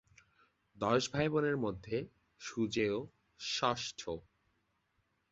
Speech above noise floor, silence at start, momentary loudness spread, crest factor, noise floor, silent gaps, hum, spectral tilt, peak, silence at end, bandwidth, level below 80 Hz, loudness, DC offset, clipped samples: 44 dB; 0.75 s; 13 LU; 22 dB; -79 dBFS; none; none; -4 dB/octave; -16 dBFS; 1.1 s; 8 kHz; -66 dBFS; -36 LUFS; under 0.1%; under 0.1%